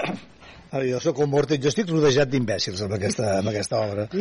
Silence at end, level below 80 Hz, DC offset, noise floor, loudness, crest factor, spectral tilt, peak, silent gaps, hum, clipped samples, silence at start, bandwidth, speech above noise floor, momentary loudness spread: 0 s; -56 dBFS; under 0.1%; -47 dBFS; -23 LUFS; 12 dB; -5 dB/octave; -10 dBFS; none; none; under 0.1%; 0 s; 11.5 kHz; 24 dB; 7 LU